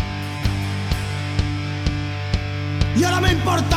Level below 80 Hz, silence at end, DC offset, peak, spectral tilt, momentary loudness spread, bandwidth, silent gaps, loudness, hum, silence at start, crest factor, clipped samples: -30 dBFS; 0 s; under 0.1%; -4 dBFS; -5.5 dB/octave; 7 LU; 15.5 kHz; none; -22 LUFS; none; 0 s; 18 dB; under 0.1%